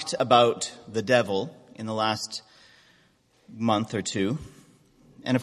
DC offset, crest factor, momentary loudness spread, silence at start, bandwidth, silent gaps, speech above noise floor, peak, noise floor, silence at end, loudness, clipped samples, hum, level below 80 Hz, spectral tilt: under 0.1%; 22 dB; 16 LU; 0 s; 13 kHz; none; 38 dB; -4 dBFS; -63 dBFS; 0 s; -25 LUFS; under 0.1%; none; -60 dBFS; -4.5 dB/octave